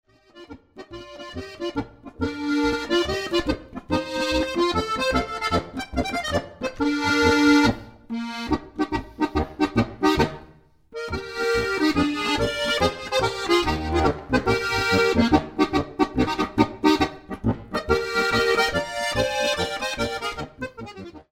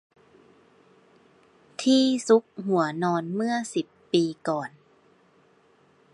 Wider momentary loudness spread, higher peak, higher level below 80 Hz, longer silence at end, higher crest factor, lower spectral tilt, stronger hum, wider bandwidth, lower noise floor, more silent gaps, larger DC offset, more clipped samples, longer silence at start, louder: about the same, 13 LU vs 11 LU; first, -2 dBFS vs -8 dBFS; first, -40 dBFS vs -78 dBFS; second, 0.1 s vs 1.45 s; about the same, 22 dB vs 20 dB; about the same, -5 dB/octave vs -5 dB/octave; neither; first, 16.5 kHz vs 11.5 kHz; second, -52 dBFS vs -61 dBFS; neither; neither; neither; second, 0.35 s vs 1.8 s; about the same, -23 LUFS vs -25 LUFS